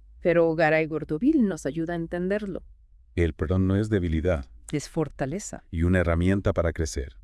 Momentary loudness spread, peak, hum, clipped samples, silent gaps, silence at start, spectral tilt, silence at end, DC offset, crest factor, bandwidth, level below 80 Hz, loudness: 10 LU; -8 dBFS; none; under 0.1%; none; 0.15 s; -7 dB/octave; 0.05 s; under 0.1%; 16 dB; 12 kHz; -40 dBFS; -26 LUFS